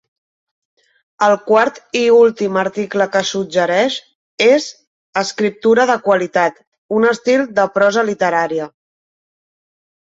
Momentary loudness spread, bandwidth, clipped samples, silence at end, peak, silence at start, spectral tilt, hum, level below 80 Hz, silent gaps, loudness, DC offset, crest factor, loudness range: 8 LU; 7.8 kHz; under 0.1%; 1.5 s; 0 dBFS; 1.2 s; -4 dB/octave; none; -64 dBFS; 4.15-4.38 s, 4.87-5.13 s, 6.67-6.72 s, 6.78-6.89 s; -15 LUFS; under 0.1%; 16 dB; 2 LU